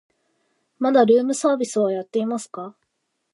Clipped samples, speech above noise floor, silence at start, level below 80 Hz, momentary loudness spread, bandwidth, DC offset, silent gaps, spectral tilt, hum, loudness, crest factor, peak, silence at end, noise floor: under 0.1%; 55 dB; 0.8 s; -76 dBFS; 18 LU; 11.5 kHz; under 0.1%; none; -5 dB/octave; none; -20 LUFS; 18 dB; -4 dBFS; 0.65 s; -75 dBFS